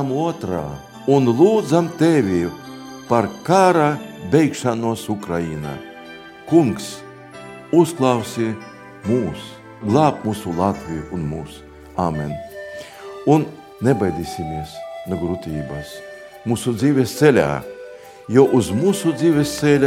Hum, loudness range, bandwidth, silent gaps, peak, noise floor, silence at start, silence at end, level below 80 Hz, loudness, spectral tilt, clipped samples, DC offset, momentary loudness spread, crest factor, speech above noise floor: none; 6 LU; 16.5 kHz; none; 0 dBFS; -38 dBFS; 0 s; 0 s; -48 dBFS; -19 LUFS; -6.5 dB/octave; under 0.1%; under 0.1%; 20 LU; 18 dB; 20 dB